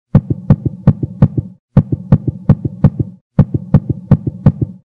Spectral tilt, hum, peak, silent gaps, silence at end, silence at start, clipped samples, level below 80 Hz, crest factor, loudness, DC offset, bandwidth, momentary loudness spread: -12 dB/octave; none; 0 dBFS; 1.59-1.68 s, 3.21-3.30 s; 0.2 s; 0.15 s; 1%; -30 dBFS; 14 dB; -15 LUFS; 0.2%; 4.1 kHz; 3 LU